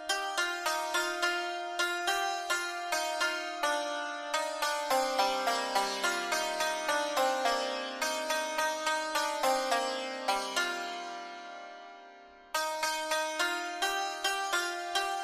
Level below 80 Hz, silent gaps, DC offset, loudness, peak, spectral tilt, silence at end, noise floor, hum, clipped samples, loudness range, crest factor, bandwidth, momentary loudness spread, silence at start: -70 dBFS; none; under 0.1%; -31 LUFS; -16 dBFS; 0.5 dB/octave; 0 s; -53 dBFS; none; under 0.1%; 4 LU; 16 dB; 15.5 kHz; 6 LU; 0 s